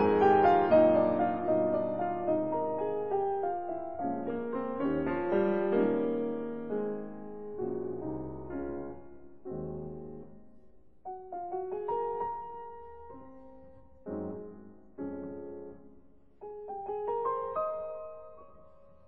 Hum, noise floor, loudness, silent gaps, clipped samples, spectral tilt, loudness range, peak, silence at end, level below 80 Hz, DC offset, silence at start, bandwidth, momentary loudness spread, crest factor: none; -60 dBFS; -32 LUFS; none; under 0.1%; -6.5 dB/octave; 13 LU; -12 dBFS; 0 s; -62 dBFS; 0.3%; 0 s; 5.2 kHz; 23 LU; 20 dB